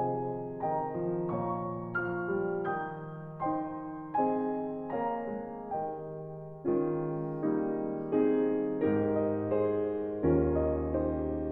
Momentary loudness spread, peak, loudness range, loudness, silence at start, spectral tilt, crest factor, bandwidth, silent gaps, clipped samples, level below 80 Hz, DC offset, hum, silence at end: 9 LU; -16 dBFS; 5 LU; -32 LUFS; 0 s; -9 dB/octave; 16 dB; 3.8 kHz; none; under 0.1%; -50 dBFS; under 0.1%; none; 0 s